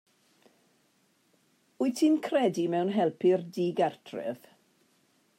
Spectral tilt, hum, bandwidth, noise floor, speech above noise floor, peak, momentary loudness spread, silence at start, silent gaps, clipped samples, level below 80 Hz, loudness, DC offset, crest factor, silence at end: -6 dB/octave; none; 16 kHz; -69 dBFS; 42 dB; -14 dBFS; 12 LU; 1.8 s; none; under 0.1%; -86 dBFS; -28 LUFS; under 0.1%; 16 dB; 1 s